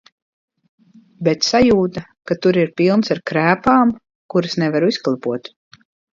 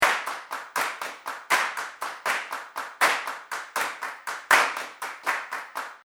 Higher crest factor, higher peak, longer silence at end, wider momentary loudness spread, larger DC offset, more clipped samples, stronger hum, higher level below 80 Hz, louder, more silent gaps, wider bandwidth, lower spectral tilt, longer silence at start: second, 18 dB vs 26 dB; about the same, 0 dBFS vs -2 dBFS; first, 0.75 s vs 0.1 s; second, 11 LU vs 14 LU; neither; neither; neither; first, -50 dBFS vs -76 dBFS; first, -17 LUFS vs -27 LUFS; first, 4.15-4.29 s vs none; second, 7.6 kHz vs over 20 kHz; first, -5.5 dB/octave vs 0.5 dB/octave; first, 1.2 s vs 0 s